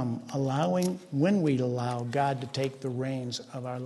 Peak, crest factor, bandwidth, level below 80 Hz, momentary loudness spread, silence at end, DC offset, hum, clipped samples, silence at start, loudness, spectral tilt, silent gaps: -14 dBFS; 16 dB; 12.5 kHz; -70 dBFS; 8 LU; 0 s; under 0.1%; none; under 0.1%; 0 s; -30 LUFS; -6.5 dB/octave; none